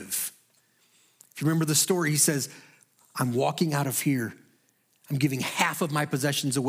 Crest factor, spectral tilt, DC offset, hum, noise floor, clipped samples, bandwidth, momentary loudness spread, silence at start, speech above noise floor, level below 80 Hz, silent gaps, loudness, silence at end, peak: 22 dB; -4 dB/octave; under 0.1%; none; -67 dBFS; under 0.1%; 16.5 kHz; 12 LU; 0 s; 42 dB; -76 dBFS; none; -26 LUFS; 0 s; -6 dBFS